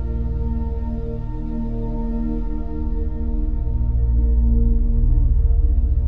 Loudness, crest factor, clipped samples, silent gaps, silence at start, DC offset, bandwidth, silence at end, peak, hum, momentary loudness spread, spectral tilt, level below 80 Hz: -23 LUFS; 12 dB; under 0.1%; none; 0 s; 2%; 1.9 kHz; 0 s; -6 dBFS; none; 8 LU; -12.5 dB/octave; -20 dBFS